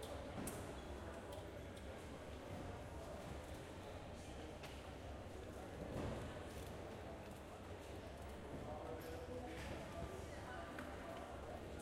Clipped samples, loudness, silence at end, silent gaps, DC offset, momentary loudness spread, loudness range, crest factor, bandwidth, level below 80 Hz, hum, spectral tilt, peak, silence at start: under 0.1%; -52 LUFS; 0 s; none; under 0.1%; 5 LU; 2 LU; 18 dB; 16 kHz; -58 dBFS; none; -5.5 dB/octave; -32 dBFS; 0 s